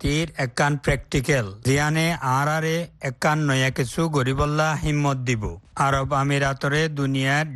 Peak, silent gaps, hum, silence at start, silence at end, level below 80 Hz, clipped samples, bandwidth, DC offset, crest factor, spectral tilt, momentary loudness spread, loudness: -6 dBFS; none; none; 0 s; 0 s; -40 dBFS; under 0.1%; 12.5 kHz; under 0.1%; 16 dB; -5.5 dB/octave; 4 LU; -22 LUFS